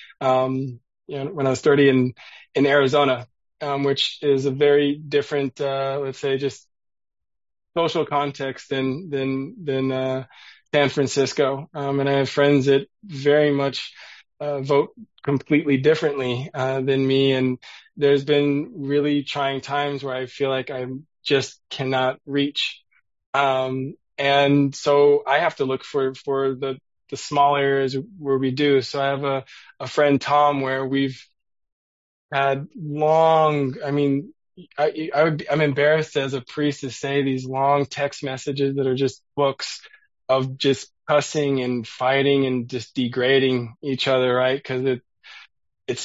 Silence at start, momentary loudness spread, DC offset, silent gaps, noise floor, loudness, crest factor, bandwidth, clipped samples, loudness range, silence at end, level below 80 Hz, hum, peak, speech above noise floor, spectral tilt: 0 s; 11 LU; under 0.1%; 23.26-23.33 s, 31.72-32.29 s; under -90 dBFS; -22 LUFS; 18 dB; 8 kHz; under 0.1%; 4 LU; 0 s; -66 dBFS; none; -4 dBFS; over 69 dB; -5.5 dB/octave